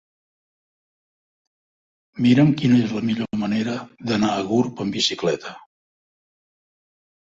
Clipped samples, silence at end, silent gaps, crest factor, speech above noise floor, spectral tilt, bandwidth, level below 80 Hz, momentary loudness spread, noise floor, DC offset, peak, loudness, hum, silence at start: under 0.1%; 1.7 s; none; 18 dB; over 70 dB; -6 dB/octave; 7.8 kHz; -60 dBFS; 12 LU; under -90 dBFS; under 0.1%; -4 dBFS; -21 LUFS; none; 2.15 s